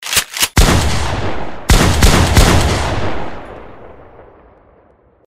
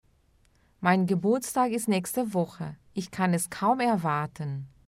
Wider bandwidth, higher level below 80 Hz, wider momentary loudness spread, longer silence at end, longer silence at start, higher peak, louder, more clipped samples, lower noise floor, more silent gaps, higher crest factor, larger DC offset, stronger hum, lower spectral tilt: about the same, 16.5 kHz vs 16 kHz; first, -18 dBFS vs -64 dBFS; first, 17 LU vs 11 LU; first, 0.7 s vs 0.2 s; second, 0 s vs 0.8 s; first, 0 dBFS vs -10 dBFS; first, -13 LUFS vs -27 LUFS; neither; second, -50 dBFS vs -64 dBFS; neither; about the same, 14 dB vs 18 dB; neither; neither; second, -4 dB/octave vs -5.5 dB/octave